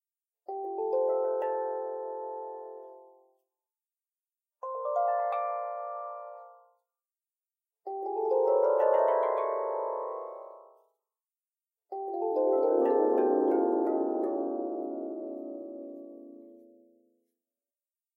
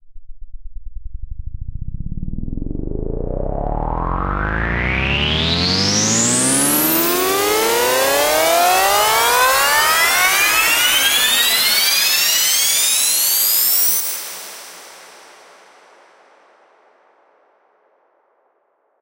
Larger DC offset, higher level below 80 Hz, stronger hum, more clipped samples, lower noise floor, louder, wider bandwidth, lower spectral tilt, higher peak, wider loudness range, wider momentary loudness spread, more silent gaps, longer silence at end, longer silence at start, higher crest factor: neither; second, under -90 dBFS vs -30 dBFS; neither; neither; first, under -90 dBFS vs -63 dBFS; second, -30 LUFS vs -14 LUFS; second, 3.8 kHz vs 16.5 kHz; first, -7.5 dB/octave vs -1.5 dB/octave; second, -12 dBFS vs -2 dBFS; second, 10 LU vs 14 LU; first, 20 LU vs 17 LU; neither; second, 1.6 s vs 3.9 s; first, 0.5 s vs 0.05 s; about the same, 18 dB vs 16 dB